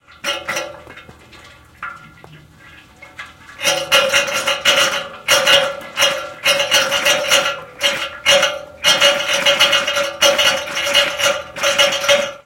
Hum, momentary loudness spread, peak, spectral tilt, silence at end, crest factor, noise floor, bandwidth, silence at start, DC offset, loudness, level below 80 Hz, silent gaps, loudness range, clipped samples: none; 12 LU; 0 dBFS; 0 dB/octave; 0.1 s; 18 dB; -43 dBFS; 17 kHz; 0.25 s; under 0.1%; -14 LUFS; -54 dBFS; none; 8 LU; under 0.1%